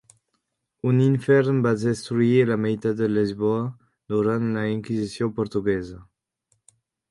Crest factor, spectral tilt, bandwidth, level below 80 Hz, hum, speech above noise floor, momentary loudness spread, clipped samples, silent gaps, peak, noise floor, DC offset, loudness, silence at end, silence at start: 18 dB; -8 dB/octave; 11.5 kHz; -56 dBFS; none; 54 dB; 9 LU; under 0.1%; none; -6 dBFS; -76 dBFS; under 0.1%; -23 LUFS; 1.05 s; 0.85 s